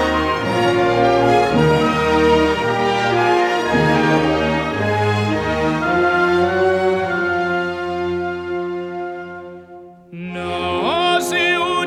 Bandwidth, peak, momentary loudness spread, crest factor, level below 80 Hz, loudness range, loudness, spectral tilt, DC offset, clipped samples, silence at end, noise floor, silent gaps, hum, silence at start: 15 kHz; -2 dBFS; 11 LU; 16 dB; -40 dBFS; 8 LU; -17 LUFS; -5.5 dB/octave; under 0.1%; under 0.1%; 0 s; -40 dBFS; none; none; 0 s